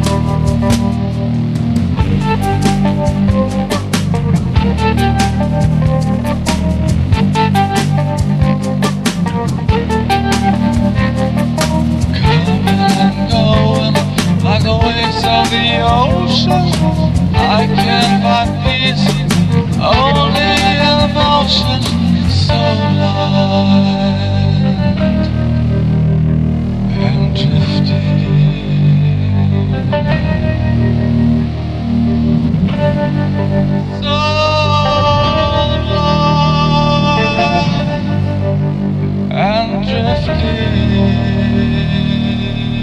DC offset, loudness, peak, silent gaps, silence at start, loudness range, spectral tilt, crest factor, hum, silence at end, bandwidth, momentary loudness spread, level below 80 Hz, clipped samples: under 0.1%; -13 LUFS; 0 dBFS; none; 0 s; 2 LU; -6.5 dB/octave; 12 dB; none; 0 s; 13.5 kHz; 4 LU; -24 dBFS; under 0.1%